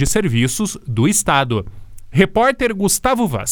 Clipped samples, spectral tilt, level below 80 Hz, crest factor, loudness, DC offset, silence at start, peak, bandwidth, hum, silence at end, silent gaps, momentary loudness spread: under 0.1%; -4.5 dB/octave; -34 dBFS; 16 dB; -16 LUFS; under 0.1%; 0 s; 0 dBFS; over 20 kHz; none; 0 s; none; 8 LU